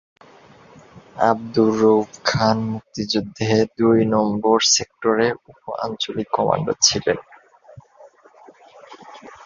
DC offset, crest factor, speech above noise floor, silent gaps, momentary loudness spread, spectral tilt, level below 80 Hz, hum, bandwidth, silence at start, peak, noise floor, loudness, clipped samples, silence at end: under 0.1%; 18 dB; 30 dB; none; 12 LU; -4 dB/octave; -54 dBFS; none; 7.4 kHz; 0.95 s; -2 dBFS; -49 dBFS; -19 LUFS; under 0.1%; 0.1 s